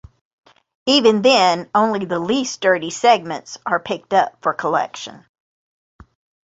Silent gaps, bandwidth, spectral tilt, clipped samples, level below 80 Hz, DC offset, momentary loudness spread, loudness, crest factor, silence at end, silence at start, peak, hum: none; 8 kHz; -3.5 dB/octave; under 0.1%; -58 dBFS; under 0.1%; 14 LU; -17 LUFS; 18 dB; 1.3 s; 0.85 s; -2 dBFS; none